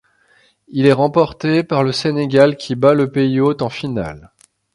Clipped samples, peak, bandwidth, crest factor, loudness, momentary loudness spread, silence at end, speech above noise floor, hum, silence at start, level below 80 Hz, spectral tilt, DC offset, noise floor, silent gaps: under 0.1%; 0 dBFS; 11.5 kHz; 16 dB; -16 LUFS; 10 LU; 0.55 s; 40 dB; none; 0.7 s; -50 dBFS; -7 dB/octave; under 0.1%; -55 dBFS; none